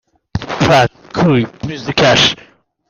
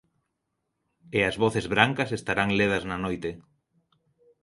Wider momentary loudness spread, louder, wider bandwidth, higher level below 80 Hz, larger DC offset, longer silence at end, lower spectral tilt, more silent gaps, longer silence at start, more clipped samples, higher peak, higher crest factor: first, 15 LU vs 9 LU; first, -13 LUFS vs -25 LUFS; first, 15 kHz vs 11.5 kHz; first, -40 dBFS vs -54 dBFS; neither; second, 0.55 s vs 1 s; about the same, -4.5 dB/octave vs -5.5 dB/octave; neither; second, 0.35 s vs 1.1 s; neither; about the same, 0 dBFS vs -2 dBFS; second, 14 dB vs 28 dB